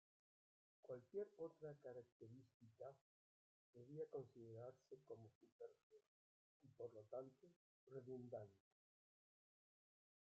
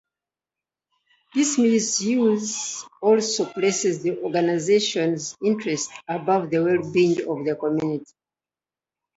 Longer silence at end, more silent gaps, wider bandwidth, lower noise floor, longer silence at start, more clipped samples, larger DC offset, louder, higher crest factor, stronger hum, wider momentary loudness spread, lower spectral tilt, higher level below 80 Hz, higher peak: first, 1.6 s vs 1.15 s; first, 2.12-2.20 s, 2.54-2.60 s, 3.01-3.73 s, 5.35-5.41 s, 5.52-5.59 s, 5.83-5.90 s, 6.07-6.60 s, 7.56-7.87 s vs none; second, 7.2 kHz vs 8.2 kHz; about the same, under -90 dBFS vs under -90 dBFS; second, 0.85 s vs 1.35 s; neither; neither; second, -59 LUFS vs -22 LUFS; about the same, 20 dB vs 16 dB; neither; first, 11 LU vs 8 LU; first, -8.5 dB/octave vs -4 dB/octave; second, under -90 dBFS vs -70 dBFS; second, -42 dBFS vs -6 dBFS